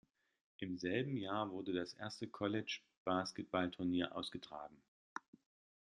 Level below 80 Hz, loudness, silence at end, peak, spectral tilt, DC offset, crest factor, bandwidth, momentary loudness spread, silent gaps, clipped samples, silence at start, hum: -78 dBFS; -42 LUFS; 0.6 s; -22 dBFS; -5.5 dB/octave; under 0.1%; 22 dB; 11.5 kHz; 14 LU; 2.97-3.05 s, 4.88-5.16 s; under 0.1%; 0.6 s; none